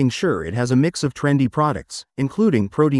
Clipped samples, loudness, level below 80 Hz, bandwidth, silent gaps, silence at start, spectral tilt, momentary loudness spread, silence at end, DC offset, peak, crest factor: under 0.1%; -20 LUFS; -50 dBFS; 12 kHz; none; 0 s; -6.5 dB/octave; 7 LU; 0 s; under 0.1%; -6 dBFS; 14 dB